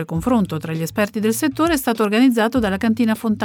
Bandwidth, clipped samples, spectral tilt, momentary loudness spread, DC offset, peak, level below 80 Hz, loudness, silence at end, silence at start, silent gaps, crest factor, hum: 19.5 kHz; under 0.1%; -5.5 dB/octave; 6 LU; under 0.1%; -4 dBFS; -44 dBFS; -18 LUFS; 0 s; 0 s; none; 14 dB; none